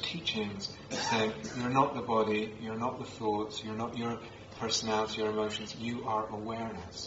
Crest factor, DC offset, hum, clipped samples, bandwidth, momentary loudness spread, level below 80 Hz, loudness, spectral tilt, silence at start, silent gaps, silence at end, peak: 22 dB; under 0.1%; none; under 0.1%; 8 kHz; 8 LU; -62 dBFS; -33 LUFS; -4 dB/octave; 0 s; none; 0 s; -12 dBFS